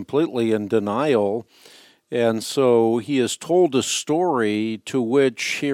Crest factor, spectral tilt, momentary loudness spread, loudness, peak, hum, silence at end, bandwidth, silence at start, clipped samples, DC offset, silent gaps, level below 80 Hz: 14 dB; -4.5 dB/octave; 7 LU; -21 LUFS; -6 dBFS; none; 0 s; 15.5 kHz; 0 s; under 0.1%; under 0.1%; none; -70 dBFS